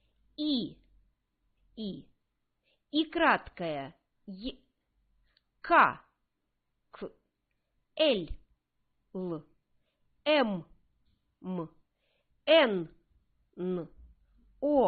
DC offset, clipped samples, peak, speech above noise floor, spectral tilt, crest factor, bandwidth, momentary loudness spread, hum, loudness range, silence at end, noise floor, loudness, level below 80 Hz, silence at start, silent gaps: under 0.1%; under 0.1%; -10 dBFS; 52 dB; -8.5 dB/octave; 24 dB; 4.8 kHz; 23 LU; none; 6 LU; 0 s; -81 dBFS; -30 LUFS; -60 dBFS; 0.4 s; none